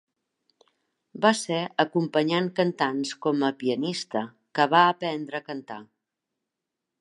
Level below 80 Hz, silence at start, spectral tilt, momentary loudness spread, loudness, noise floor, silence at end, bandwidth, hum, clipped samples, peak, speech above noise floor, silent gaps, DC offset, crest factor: -80 dBFS; 1.15 s; -4.5 dB/octave; 13 LU; -25 LUFS; -85 dBFS; 1.15 s; 11.5 kHz; none; under 0.1%; -6 dBFS; 60 dB; none; under 0.1%; 22 dB